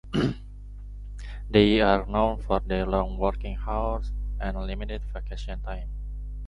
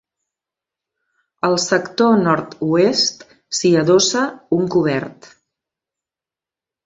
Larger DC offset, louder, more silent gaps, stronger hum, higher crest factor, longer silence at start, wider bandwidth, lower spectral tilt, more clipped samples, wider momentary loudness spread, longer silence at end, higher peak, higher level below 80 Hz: neither; second, -27 LUFS vs -17 LUFS; neither; first, 50 Hz at -30 dBFS vs none; about the same, 22 dB vs 18 dB; second, 0.05 s vs 1.45 s; about the same, 7.8 kHz vs 7.8 kHz; first, -7.5 dB/octave vs -4 dB/octave; neither; first, 19 LU vs 8 LU; second, 0 s vs 1.7 s; about the same, -4 dBFS vs -2 dBFS; first, -32 dBFS vs -60 dBFS